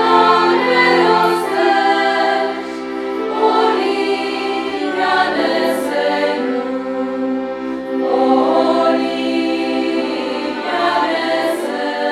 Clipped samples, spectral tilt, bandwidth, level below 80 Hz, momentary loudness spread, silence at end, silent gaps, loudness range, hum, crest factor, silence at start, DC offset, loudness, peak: under 0.1%; -4 dB/octave; 14.5 kHz; -58 dBFS; 9 LU; 0 s; none; 3 LU; none; 16 dB; 0 s; under 0.1%; -16 LUFS; 0 dBFS